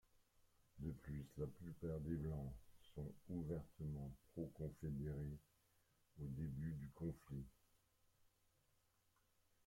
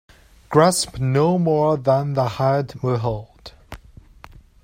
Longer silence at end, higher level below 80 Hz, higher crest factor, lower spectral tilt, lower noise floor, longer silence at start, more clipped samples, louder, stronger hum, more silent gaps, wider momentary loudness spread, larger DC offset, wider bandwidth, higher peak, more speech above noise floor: first, 2.15 s vs 0.85 s; second, -64 dBFS vs -48 dBFS; about the same, 18 dB vs 18 dB; first, -9 dB/octave vs -6 dB/octave; first, -81 dBFS vs -45 dBFS; first, 0.75 s vs 0.5 s; neither; second, -51 LUFS vs -19 LUFS; neither; neither; about the same, 8 LU vs 7 LU; neither; about the same, 16.5 kHz vs 16 kHz; second, -34 dBFS vs -2 dBFS; first, 32 dB vs 27 dB